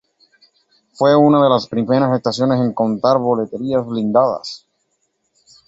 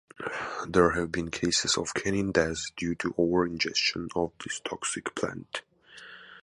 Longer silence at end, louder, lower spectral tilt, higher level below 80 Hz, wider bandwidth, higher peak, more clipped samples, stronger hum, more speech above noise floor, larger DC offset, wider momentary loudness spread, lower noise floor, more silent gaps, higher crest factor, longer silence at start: first, 1.1 s vs 0 s; first, -16 LUFS vs -28 LUFS; first, -7 dB/octave vs -3.5 dB/octave; second, -58 dBFS vs -52 dBFS; second, 8 kHz vs 11.5 kHz; first, -2 dBFS vs -8 dBFS; neither; neither; first, 53 dB vs 21 dB; neither; second, 9 LU vs 13 LU; first, -68 dBFS vs -50 dBFS; neither; second, 16 dB vs 22 dB; first, 1 s vs 0.2 s